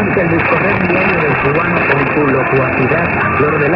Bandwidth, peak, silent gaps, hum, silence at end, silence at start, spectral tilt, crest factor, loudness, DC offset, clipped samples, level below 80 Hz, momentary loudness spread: 5.8 kHz; 0 dBFS; none; none; 0 s; 0 s; -10 dB/octave; 12 dB; -12 LUFS; under 0.1%; under 0.1%; -36 dBFS; 1 LU